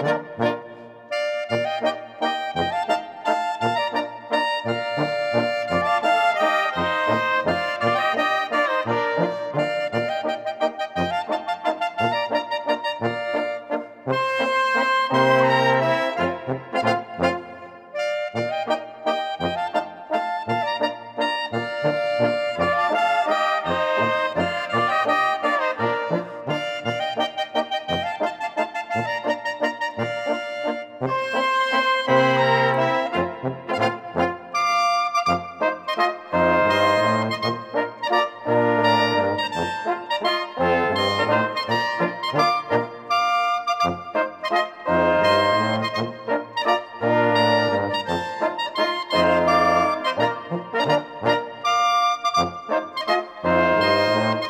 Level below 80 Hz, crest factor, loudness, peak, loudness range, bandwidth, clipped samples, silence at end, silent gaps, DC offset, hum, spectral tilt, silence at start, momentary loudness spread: -58 dBFS; 16 dB; -22 LUFS; -6 dBFS; 5 LU; 15.5 kHz; under 0.1%; 0 s; none; under 0.1%; none; -5 dB/octave; 0 s; 8 LU